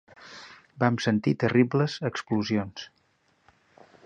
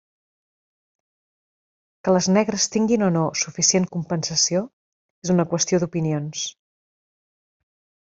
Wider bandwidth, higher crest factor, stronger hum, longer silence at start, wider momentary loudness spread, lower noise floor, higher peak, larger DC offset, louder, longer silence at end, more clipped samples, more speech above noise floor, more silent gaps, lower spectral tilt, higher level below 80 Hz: first, 9 kHz vs 8 kHz; about the same, 20 dB vs 20 dB; neither; second, 0.2 s vs 2.05 s; first, 23 LU vs 10 LU; second, -68 dBFS vs under -90 dBFS; second, -8 dBFS vs -4 dBFS; neither; second, -26 LUFS vs -21 LUFS; second, 1.2 s vs 1.65 s; neither; second, 43 dB vs over 69 dB; second, none vs 4.73-5.22 s; first, -6.5 dB/octave vs -4 dB/octave; about the same, -62 dBFS vs -62 dBFS